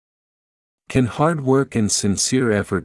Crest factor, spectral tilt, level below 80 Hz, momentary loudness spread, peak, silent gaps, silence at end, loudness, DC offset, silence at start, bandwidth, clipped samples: 16 dB; -4.5 dB/octave; -50 dBFS; 3 LU; -4 dBFS; none; 0 s; -19 LUFS; under 0.1%; 0.9 s; 12 kHz; under 0.1%